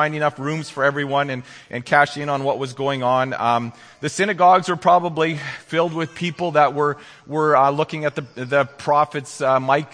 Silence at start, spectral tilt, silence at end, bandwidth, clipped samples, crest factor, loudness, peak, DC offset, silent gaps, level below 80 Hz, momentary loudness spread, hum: 0 s; -5.5 dB/octave; 0.05 s; 10.5 kHz; under 0.1%; 20 dB; -20 LUFS; 0 dBFS; under 0.1%; none; -66 dBFS; 11 LU; none